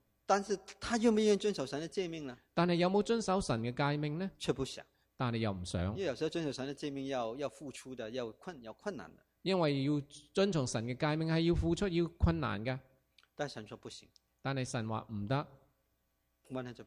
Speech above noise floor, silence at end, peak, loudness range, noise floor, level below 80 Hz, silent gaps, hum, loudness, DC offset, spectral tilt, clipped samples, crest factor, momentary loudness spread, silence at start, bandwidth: 44 dB; 0 s; -16 dBFS; 8 LU; -79 dBFS; -52 dBFS; none; none; -35 LUFS; under 0.1%; -6 dB/octave; under 0.1%; 20 dB; 14 LU; 0.3 s; 13.5 kHz